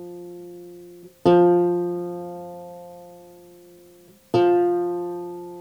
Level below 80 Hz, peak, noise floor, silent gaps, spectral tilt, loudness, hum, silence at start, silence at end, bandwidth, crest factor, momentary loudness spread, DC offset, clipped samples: -66 dBFS; -4 dBFS; -51 dBFS; none; -8.5 dB/octave; -21 LUFS; none; 0 s; 0 s; 6.6 kHz; 20 dB; 24 LU; under 0.1%; under 0.1%